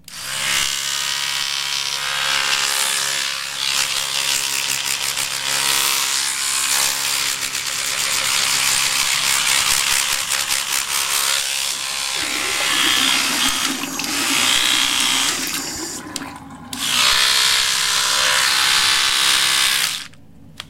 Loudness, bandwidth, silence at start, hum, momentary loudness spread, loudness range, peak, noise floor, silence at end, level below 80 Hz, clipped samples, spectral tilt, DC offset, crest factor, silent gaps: -16 LUFS; 17 kHz; 0.1 s; none; 7 LU; 4 LU; 0 dBFS; -45 dBFS; 0 s; -52 dBFS; under 0.1%; 1 dB/octave; under 0.1%; 18 dB; none